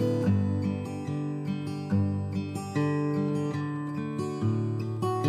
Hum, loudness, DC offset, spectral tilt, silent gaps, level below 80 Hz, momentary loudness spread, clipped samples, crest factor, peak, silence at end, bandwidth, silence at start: none; -30 LUFS; under 0.1%; -8 dB/octave; none; -68 dBFS; 6 LU; under 0.1%; 14 dB; -14 dBFS; 0 s; 12 kHz; 0 s